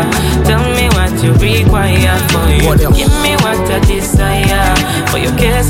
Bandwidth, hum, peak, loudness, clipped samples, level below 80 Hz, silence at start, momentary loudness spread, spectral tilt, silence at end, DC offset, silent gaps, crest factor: 17 kHz; none; 0 dBFS; -11 LUFS; under 0.1%; -16 dBFS; 0 s; 3 LU; -5 dB/octave; 0 s; under 0.1%; none; 10 dB